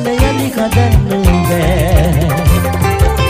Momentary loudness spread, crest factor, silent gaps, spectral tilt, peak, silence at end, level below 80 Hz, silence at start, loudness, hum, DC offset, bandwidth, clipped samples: 2 LU; 10 dB; none; -6 dB/octave; 0 dBFS; 0 s; -16 dBFS; 0 s; -12 LUFS; none; under 0.1%; 16 kHz; under 0.1%